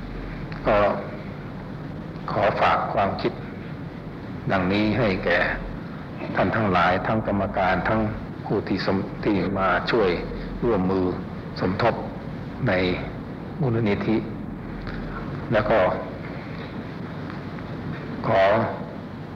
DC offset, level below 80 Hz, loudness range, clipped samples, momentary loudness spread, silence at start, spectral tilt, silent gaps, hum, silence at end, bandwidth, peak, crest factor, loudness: under 0.1%; -42 dBFS; 4 LU; under 0.1%; 14 LU; 0 s; -8 dB/octave; none; none; 0 s; 7.4 kHz; -8 dBFS; 16 dB; -25 LUFS